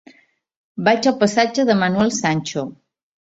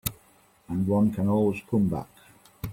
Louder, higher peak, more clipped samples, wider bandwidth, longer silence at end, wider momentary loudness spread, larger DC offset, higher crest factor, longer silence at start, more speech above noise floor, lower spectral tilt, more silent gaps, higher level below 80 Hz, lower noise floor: first, -18 LUFS vs -26 LUFS; first, -2 dBFS vs -12 dBFS; neither; second, 8 kHz vs 16.5 kHz; first, 0.6 s vs 0 s; about the same, 11 LU vs 12 LU; neither; about the same, 18 dB vs 16 dB; first, 0.75 s vs 0.05 s; about the same, 37 dB vs 35 dB; second, -4.5 dB/octave vs -7.5 dB/octave; neither; second, -58 dBFS vs -52 dBFS; second, -54 dBFS vs -60 dBFS